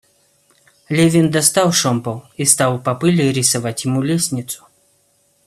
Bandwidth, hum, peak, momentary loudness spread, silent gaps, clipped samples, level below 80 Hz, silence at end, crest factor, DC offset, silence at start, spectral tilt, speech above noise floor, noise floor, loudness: 14.5 kHz; none; 0 dBFS; 9 LU; none; under 0.1%; -56 dBFS; 0.9 s; 18 dB; under 0.1%; 0.9 s; -4 dB/octave; 43 dB; -59 dBFS; -16 LUFS